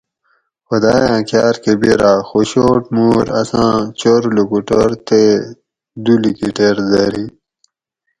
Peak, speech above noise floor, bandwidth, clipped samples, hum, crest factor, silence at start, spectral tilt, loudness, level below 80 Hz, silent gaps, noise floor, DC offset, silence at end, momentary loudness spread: 0 dBFS; 59 dB; 11 kHz; under 0.1%; none; 14 dB; 0.7 s; -6 dB/octave; -13 LUFS; -44 dBFS; none; -72 dBFS; under 0.1%; 0.9 s; 6 LU